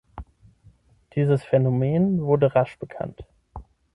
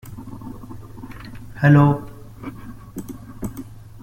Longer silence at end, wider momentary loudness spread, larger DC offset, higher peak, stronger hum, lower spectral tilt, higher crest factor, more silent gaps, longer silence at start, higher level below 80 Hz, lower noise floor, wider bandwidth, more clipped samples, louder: about the same, 0.35 s vs 0.3 s; second, 19 LU vs 24 LU; neither; second, -6 dBFS vs -2 dBFS; neither; first, -10 dB/octave vs -8.5 dB/octave; about the same, 18 dB vs 20 dB; neither; about the same, 0.15 s vs 0.05 s; second, -50 dBFS vs -44 dBFS; first, -56 dBFS vs -37 dBFS; second, 5.2 kHz vs 15 kHz; neither; second, -22 LUFS vs -18 LUFS